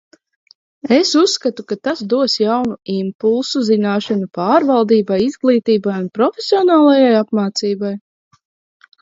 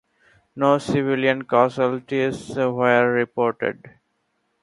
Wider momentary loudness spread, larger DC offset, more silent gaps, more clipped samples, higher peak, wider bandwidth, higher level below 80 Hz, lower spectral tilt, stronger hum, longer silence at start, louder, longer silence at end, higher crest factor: first, 10 LU vs 7 LU; neither; first, 3.15-3.19 s vs none; neither; about the same, 0 dBFS vs -2 dBFS; second, 7.8 kHz vs 11.5 kHz; about the same, -62 dBFS vs -60 dBFS; second, -5 dB/octave vs -6.5 dB/octave; neither; first, 0.85 s vs 0.55 s; first, -15 LUFS vs -21 LUFS; first, 1.05 s vs 0.9 s; about the same, 16 dB vs 20 dB